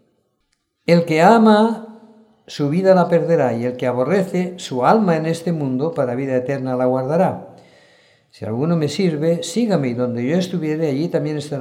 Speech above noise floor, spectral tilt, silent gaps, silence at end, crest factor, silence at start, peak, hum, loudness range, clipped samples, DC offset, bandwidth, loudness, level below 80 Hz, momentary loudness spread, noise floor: 52 dB; -7 dB/octave; none; 0 s; 18 dB; 0.9 s; 0 dBFS; none; 5 LU; under 0.1%; under 0.1%; 14 kHz; -18 LUFS; -68 dBFS; 10 LU; -69 dBFS